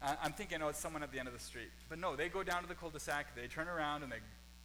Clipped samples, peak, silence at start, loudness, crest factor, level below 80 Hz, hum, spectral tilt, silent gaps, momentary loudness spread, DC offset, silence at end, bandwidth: under 0.1%; -26 dBFS; 0 s; -42 LUFS; 18 dB; -58 dBFS; none; -3.5 dB/octave; none; 9 LU; under 0.1%; 0 s; 19.5 kHz